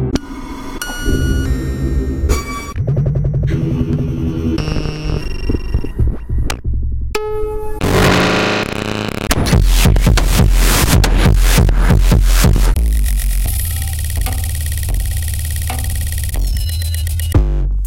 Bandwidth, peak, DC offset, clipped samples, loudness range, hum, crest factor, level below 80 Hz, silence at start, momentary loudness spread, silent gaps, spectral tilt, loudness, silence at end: 17 kHz; 0 dBFS; under 0.1%; under 0.1%; 7 LU; none; 14 dB; -16 dBFS; 0 s; 9 LU; none; -5 dB/octave; -16 LUFS; 0 s